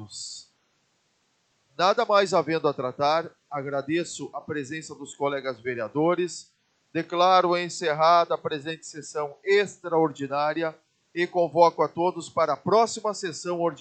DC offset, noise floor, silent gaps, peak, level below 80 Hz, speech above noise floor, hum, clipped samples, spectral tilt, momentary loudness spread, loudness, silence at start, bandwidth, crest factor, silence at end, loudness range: under 0.1%; -70 dBFS; none; -4 dBFS; -78 dBFS; 45 dB; none; under 0.1%; -4.5 dB/octave; 15 LU; -25 LUFS; 0 s; 9.2 kHz; 22 dB; 0 s; 5 LU